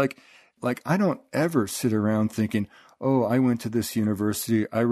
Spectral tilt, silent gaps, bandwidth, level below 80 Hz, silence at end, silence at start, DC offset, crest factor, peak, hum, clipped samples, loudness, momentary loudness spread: -6 dB/octave; none; 13.5 kHz; -62 dBFS; 0 s; 0 s; under 0.1%; 16 dB; -8 dBFS; none; under 0.1%; -25 LUFS; 7 LU